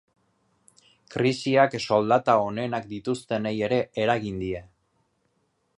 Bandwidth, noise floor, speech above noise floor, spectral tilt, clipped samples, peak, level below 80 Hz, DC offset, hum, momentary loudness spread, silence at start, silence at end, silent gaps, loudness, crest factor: 11.5 kHz; -71 dBFS; 47 dB; -6 dB/octave; under 0.1%; -4 dBFS; -58 dBFS; under 0.1%; none; 10 LU; 1.1 s; 1.15 s; none; -25 LUFS; 22 dB